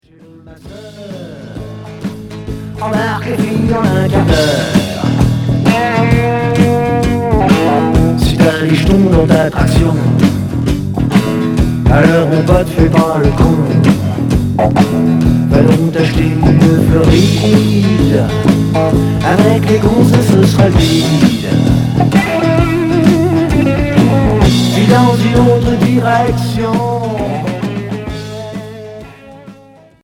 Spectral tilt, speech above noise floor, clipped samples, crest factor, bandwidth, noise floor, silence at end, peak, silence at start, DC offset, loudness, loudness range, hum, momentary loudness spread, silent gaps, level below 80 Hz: -7 dB/octave; 31 dB; 0.3%; 10 dB; 17 kHz; -41 dBFS; 0.5 s; 0 dBFS; 0.45 s; under 0.1%; -11 LUFS; 5 LU; none; 13 LU; none; -24 dBFS